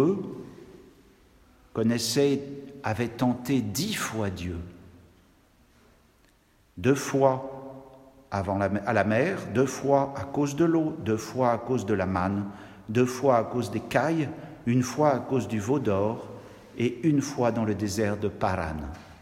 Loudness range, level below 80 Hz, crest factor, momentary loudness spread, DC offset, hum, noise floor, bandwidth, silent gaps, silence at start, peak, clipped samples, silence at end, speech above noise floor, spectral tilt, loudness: 5 LU; -56 dBFS; 22 dB; 14 LU; under 0.1%; none; -62 dBFS; 16 kHz; none; 0 s; -6 dBFS; under 0.1%; 0.05 s; 36 dB; -6 dB/octave; -27 LUFS